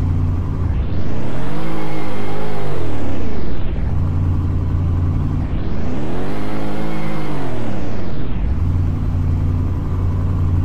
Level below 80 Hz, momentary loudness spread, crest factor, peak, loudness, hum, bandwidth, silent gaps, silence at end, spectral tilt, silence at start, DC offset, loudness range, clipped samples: -24 dBFS; 6 LU; 10 dB; -4 dBFS; -22 LUFS; none; 7.6 kHz; none; 0 s; -8.5 dB/octave; 0 s; 20%; 3 LU; under 0.1%